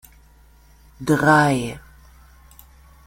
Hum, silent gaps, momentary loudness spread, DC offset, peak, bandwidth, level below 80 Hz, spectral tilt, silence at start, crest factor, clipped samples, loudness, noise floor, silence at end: none; none; 17 LU; under 0.1%; -4 dBFS; 16.5 kHz; -48 dBFS; -6 dB/octave; 1 s; 20 dB; under 0.1%; -18 LUFS; -51 dBFS; 1.25 s